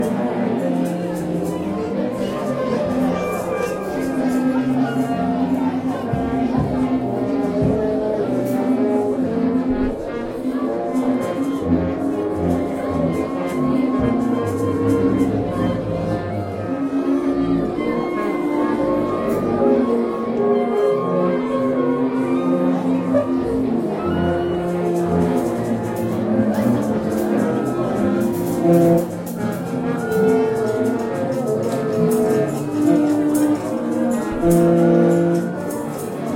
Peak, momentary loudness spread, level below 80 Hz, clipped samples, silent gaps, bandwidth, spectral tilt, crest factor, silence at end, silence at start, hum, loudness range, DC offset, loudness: -4 dBFS; 6 LU; -44 dBFS; under 0.1%; none; 16.5 kHz; -7.5 dB/octave; 16 dB; 0 s; 0 s; none; 3 LU; under 0.1%; -20 LUFS